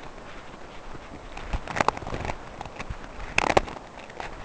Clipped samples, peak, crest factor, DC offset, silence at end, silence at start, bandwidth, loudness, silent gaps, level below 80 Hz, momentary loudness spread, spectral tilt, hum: under 0.1%; -2 dBFS; 28 dB; 0.1%; 0 s; 0 s; 8 kHz; -29 LUFS; none; -42 dBFS; 18 LU; -4 dB/octave; none